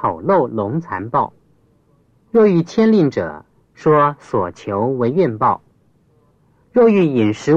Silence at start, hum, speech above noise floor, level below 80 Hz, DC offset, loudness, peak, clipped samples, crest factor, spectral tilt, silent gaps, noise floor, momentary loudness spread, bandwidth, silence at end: 0 s; none; 41 dB; -56 dBFS; under 0.1%; -16 LUFS; -2 dBFS; under 0.1%; 16 dB; -8 dB/octave; none; -56 dBFS; 10 LU; 7.8 kHz; 0 s